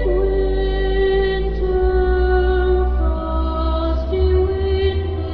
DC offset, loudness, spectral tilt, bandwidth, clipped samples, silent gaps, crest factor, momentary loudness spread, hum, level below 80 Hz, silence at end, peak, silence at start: under 0.1%; -19 LUFS; -10 dB/octave; 5.2 kHz; under 0.1%; none; 10 dB; 4 LU; none; -20 dBFS; 0 s; -6 dBFS; 0 s